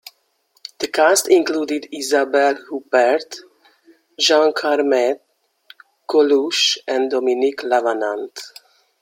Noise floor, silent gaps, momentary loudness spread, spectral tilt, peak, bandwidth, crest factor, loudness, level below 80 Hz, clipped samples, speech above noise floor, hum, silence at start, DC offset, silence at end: -63 dBFS; none; 17 LU; -1 dB/octave; 0 dBFS; 16.5 kHz; 18 dB; -17 LUFS; -72 dBFS; under 0.1%; 46 dB; none; 0.8 s; under 0.1%; 0.55 s